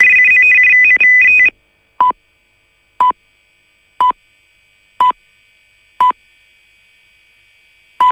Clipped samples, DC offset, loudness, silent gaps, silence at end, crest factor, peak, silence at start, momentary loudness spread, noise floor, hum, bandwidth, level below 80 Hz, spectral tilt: under 0.1%; under 0.1%; -9 LUFS; none; 0 s; 14 dB; 0 dBFS; 0 s; 22 LU; -56 dBFS; none; 11 kHz; -54 dBFS; -1.5 dB/octave